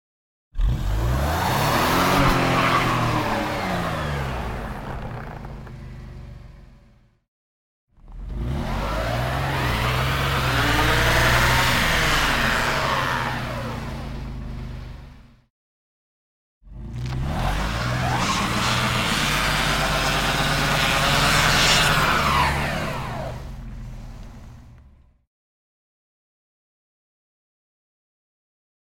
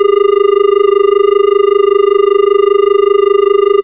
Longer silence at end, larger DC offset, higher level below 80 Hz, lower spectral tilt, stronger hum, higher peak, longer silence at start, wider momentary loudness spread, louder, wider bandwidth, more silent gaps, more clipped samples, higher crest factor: first, 4.05 s vs 0 s; second, under 0.1% vs 0.4%; first, -32 dBFS vs -62 dBFS; second, -4 dB/octave vs -7.5 dB/octave; neither; second, -4 dBFS vs 0 dBFS; first, 0.55 s vs 0 s; first, 20 LU vs 0 LU; second, -21 LUFS vs -9 LUFS; first, 17 kHz vs 3.9 kHz; first, 7.28-7.87 s, 15.50-16.61 s vs none; neither; first, 20 dB vs 8 dB